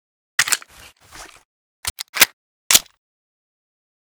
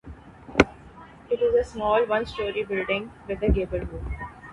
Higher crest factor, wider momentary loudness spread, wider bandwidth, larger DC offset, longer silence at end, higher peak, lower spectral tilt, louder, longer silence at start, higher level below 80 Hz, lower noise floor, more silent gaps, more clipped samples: about the same, 24 dB vs 26 dB; about the same, 14 LU vs 12 LU; first, over 20 kHz vs 11 kHz; neither; first, 1.3 s vs 0 s; about the same, 0 dBFS vs 0 dBFS; second, 1.5 dB/octave vs -6 dB/octave; first, -17 LUFS vs -26 LUFS; first, 0.4 s vs 0.05 s; second, -54 dBFS vs -36 dBFS; about the same, -47 dBFS vs -47 dBFS; first, 1.45-1.83 s, 1.90-1.96 s, 2.09-2.13 s, 2.33-2.70 s vs none; neither